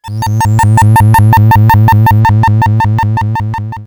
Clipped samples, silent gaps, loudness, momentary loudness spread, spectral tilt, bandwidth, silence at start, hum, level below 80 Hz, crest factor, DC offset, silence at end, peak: under 0.1%; none; -8 LUFS; 8 LU; -6.5 dB/octave; 19.5 kHz; 0.05 s; none; -28 dBFS; 8 dB; under 0.1%; 0 s; 0 dBFS